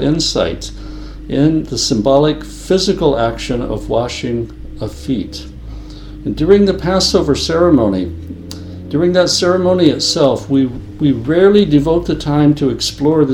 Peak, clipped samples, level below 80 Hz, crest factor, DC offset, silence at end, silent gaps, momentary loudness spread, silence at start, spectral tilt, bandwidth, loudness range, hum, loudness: 0 dBFS; under 0.1%; -32 dBFS; 14 dB; under 0.1%; 0 s; none; 18 LU; 0 s; -5.5 dB/octave; 13.5 kHz; 5 LU; none; -14 LUFS